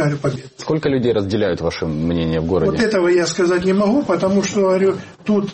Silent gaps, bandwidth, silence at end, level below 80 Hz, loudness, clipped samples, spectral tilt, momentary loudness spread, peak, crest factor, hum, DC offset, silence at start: none; 8.8 kHz; 0 s; -42 dBFS; -18 LUFS; under 0.1%; -6 dB/octave; 6 LU; -4 dBFS; 12 dB; none; under 0.1%; 0 s